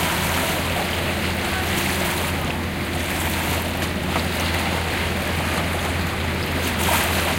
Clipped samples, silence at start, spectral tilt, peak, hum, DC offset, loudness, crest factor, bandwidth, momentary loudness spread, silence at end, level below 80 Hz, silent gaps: under 0.1%; 0 s; -4 dB/octave; -6 dBFS; none; under 0.1%; -22 LUFS; 16 dB; 17 kHz; 4 LU; 0 s; -34 dBFS; none